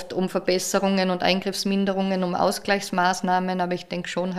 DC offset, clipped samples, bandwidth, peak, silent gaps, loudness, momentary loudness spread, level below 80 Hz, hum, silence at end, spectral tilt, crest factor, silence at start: under 0.1%; under 0.1%; 15 kHz; -6 dBFS; none; -23 LUFS; 5 LU; -58 dBFS; none; 0 s; -4.5 dB/octave; 18 dB; 0 s